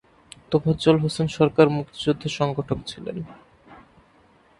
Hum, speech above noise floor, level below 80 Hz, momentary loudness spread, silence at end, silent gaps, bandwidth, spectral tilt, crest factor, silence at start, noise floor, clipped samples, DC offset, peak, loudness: none; 35 dB; -52 dBFS; 15 LU; 0.85 s; none; 11.5 kHz; -6.5 dB/octave; 22 dB; 0.5 s; -57 dBFS; under 0.1%; under 0.1%; -2 dBFS; -23 LUFS